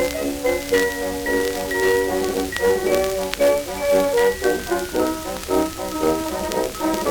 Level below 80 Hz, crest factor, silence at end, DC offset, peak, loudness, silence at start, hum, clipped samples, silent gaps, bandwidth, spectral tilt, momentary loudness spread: -40 dBFS; 20 dB; 0 s; under 0.1%; 0 dBFS; -21 LUFS; 0 s; none; under 0.1%; none; over 20 kHz; -3.5 dB/octave; 5 LU